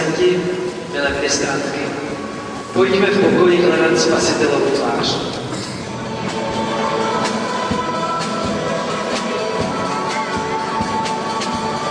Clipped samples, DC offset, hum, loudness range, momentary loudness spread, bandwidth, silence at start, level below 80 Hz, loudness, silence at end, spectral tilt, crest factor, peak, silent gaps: under 0.1%; under 0.1%; none; 5 LU; 10 LU; 10.5 kHz; 0 s; -46 dBFS; -18 LUFS; 0 s; -4 dB/octave; 16 dB; -2 dBFS; none